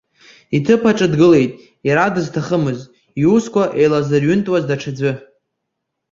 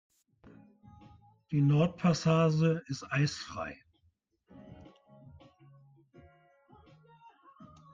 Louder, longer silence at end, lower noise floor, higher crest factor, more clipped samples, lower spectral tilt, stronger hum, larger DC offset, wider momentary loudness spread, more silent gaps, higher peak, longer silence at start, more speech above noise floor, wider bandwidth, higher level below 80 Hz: first, -16 LUFS vs -30 LUFS; first, 0.95 s vs 0.3 s; about the same, -76 dBFS vs -73 dBFS; about the same, 14 dB vs 18 dB; neither; about the same, -7 dB/octave vs -6.5 dB/octave; neither; neither; second, 10 LU vs 26 LU; neither; first, -2 dBFS vs -16 dBFS; second, 0.5 s vs 1.5 s; first, 62 dB vs 44 dB; about the same, 7.6 kHz vs 7.6 kHz; first, -52 dBFS vs -66 dBFS